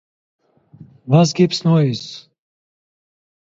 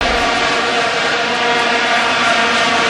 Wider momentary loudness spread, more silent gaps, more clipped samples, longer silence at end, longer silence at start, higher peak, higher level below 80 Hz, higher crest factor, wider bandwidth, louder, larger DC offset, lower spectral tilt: first, 21 LU vs 2 LU; neither; neither; first, 1.25 s vs 0 s; first, 1.05 s vs 0 s; about the same, -2 dBFS vs 0 dBFS; second, -62 dBFS vs -38 dBFS; about the same, 18 dB vs 14 dB; second, 7.8 kHz vs 12.5 kHz; second, -16 LUFS vs -13 LUFS; second, under 0.1% vs 0.1%; first, -6.5 dB/octave vs -2 dB/octave